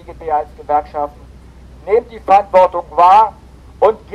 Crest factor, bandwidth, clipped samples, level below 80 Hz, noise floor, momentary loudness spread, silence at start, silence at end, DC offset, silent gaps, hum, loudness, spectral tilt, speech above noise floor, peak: 14 dB; 10.5 kHz; under 0.1%; -40 dBFS; -38 dBFS; 14 LU; 0.1 s; 0 s; under 0.1%; none; none; -14 LUFS; -5.5 dB/octave; 25 dB; -2 dBFS